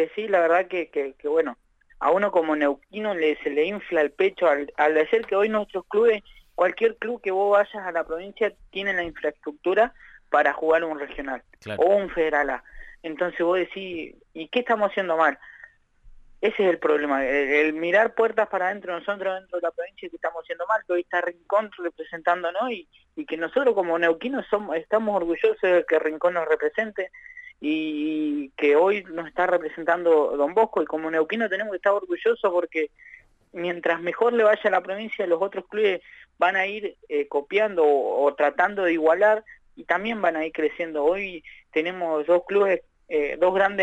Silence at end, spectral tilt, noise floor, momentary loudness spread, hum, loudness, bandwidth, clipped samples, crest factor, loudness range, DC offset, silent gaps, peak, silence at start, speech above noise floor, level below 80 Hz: 0 s; -6 dB/octave; -51 dBFS; 11 LU; none; -24 LUFS; 8 kHz; under 0.1%; 18 dB; 3 LU; under 0.1%; none; -6 dBFS; 0 s; 28 dB; -58 dBFS